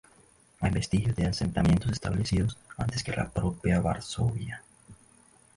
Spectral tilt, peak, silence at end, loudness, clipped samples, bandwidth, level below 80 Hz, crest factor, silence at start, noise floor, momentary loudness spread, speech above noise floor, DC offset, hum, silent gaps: -6 dB/octave; -12 dBFS; 0.65 s; -29 LUFS; under 0.1%; 11.5 kHz; -42 dBFS; 16 dB; 0.6 s; -60 dBFS; 8 LU; 32 dB; under 0.1%; none; none